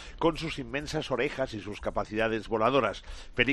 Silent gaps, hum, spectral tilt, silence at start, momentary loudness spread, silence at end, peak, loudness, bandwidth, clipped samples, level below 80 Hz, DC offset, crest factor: none; none; -5 dB/octave; 0 s; 9 LU; 0 s; -6 dBFS; -30 LUFS; 11.5 kHz; under 0.1%; -46 dBFS; under 0.1%; 22 dB